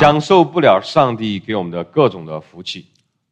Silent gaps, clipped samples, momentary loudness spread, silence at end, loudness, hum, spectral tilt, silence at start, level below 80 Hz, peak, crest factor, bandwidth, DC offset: none; under 0.1%; 17 LU; 0.5 s; -15 LUFS; none; -6.5 dB/octave; 0 s; -52 dBFS; 0 dBFS; 16 dB; 9.4 kHz; under 0.1%